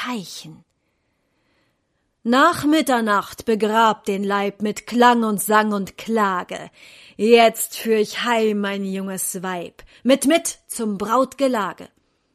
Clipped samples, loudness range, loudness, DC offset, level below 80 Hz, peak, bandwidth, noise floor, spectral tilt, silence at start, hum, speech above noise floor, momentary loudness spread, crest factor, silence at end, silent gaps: under 0.1%; 3 LU; -19 LUFS; under 0.1%; -62 dBFS; -2 dBFS; 15.5 kHz; -70 dBFS; -4 dB/octave; 0 s; none; 50 dB; 13 LU; 18 dB; 0.5 s; none